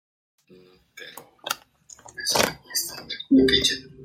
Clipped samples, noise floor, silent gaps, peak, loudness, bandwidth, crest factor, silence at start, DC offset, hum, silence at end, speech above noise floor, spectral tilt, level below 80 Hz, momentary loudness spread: under 0.1%; -54 dBFS; none; -2 dBFS; -23 LUFS; 16.5 kHz; 24 dB; 0.95 s; under 0.1%; none; 0 s; 31 dB; -2.5 dB/octave; -52 dBFS; 23 LU